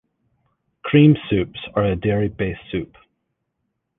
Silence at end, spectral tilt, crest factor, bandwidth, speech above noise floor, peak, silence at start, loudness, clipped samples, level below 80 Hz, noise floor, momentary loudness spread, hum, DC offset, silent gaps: 1.15 s; -11 dB/octave; 20 dB; 3.9 kHz; 57 dB; -2 dBFS; 0.85 s; -19 LUFS; under 0.1%; -44 dBFS; -75 dBFS; 15 LU; none; under 0.1%; none